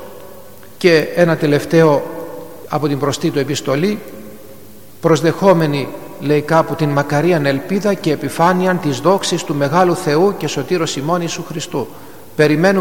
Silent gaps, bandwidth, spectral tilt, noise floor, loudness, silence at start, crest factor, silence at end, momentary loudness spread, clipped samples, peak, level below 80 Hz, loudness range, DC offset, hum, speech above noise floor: none; 17.5 kHz; -5.5 dB/octave; -40 dBFS; -15 LUFS; 0 s; 16 dB; 0 s; 14 LU; under 0.1%; 0 dBFS; -54 dBFS; 2 LU; 1%; none; 25 dB